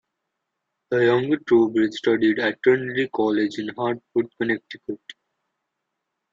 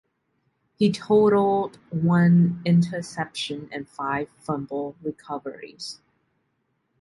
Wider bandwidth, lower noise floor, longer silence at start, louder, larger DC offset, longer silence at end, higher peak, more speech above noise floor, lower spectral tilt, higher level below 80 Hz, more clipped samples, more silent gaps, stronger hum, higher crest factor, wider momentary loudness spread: second, 7.6 kHz vs 11.5 kHz; first, -80 dBFS vs -73 dBFS; about the same, 0.9 s vs 0.8 s; about the same, -22 LUFS vs -23 LUFS; neither; first, 1.2 s vs 1.05 s; about the same, -6 dBFS vs -8 dBFS; first, 59 dB vs 50 dB; about the same, -6.5 dB/octave vs -7.5 dB/octave; about the same, -66 dBFS vs -62 dBFS; neither; neither; neither; about the same, 18 dB vs 16 dB; second, 9 LU vs 18 LU